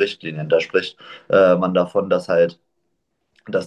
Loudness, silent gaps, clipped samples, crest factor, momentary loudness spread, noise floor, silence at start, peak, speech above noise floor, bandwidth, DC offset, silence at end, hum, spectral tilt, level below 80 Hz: -18 LUFS; none; under 0.1%; 16 dB; 10 LU; -73 dBFS; 0 s; -4 dBFS; 55 dB; 9.8 kHz; under 0.1%; 0 s; none; -6.5 dB/octave; -60 dBFS